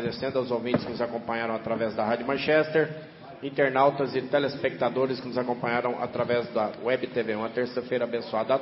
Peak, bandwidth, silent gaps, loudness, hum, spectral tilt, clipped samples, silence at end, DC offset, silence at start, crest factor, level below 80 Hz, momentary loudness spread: -8 dBFS; 5.8 kHz; none; -27 LUFS; none; -9.5 dB/octave; under 0.1%; 0 s; under 0.1%; 0 s; 18 dB; -64 dBFS; 7 LU